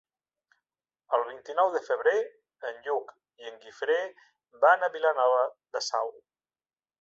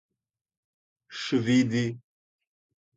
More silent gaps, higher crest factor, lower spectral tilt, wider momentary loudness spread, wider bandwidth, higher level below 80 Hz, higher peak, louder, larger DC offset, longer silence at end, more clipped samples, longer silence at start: neither; about the same, 22 dB vs 18 dB; second, -0.5 dB/octave vs -6 dB/octave; about the same, 17 LU vs 18 LU; about the same, 7.8 kHz vs 7.8 kHz; second, -84 dBFS vs -68 dBFS; first, -8 dBFS vs -12 dBFS; about the same, -28 LUFS vs -26 LUFS; neither; about the same, 0.9 s vs 1 s; neither; about the same, 1.1 s vs 1.1 s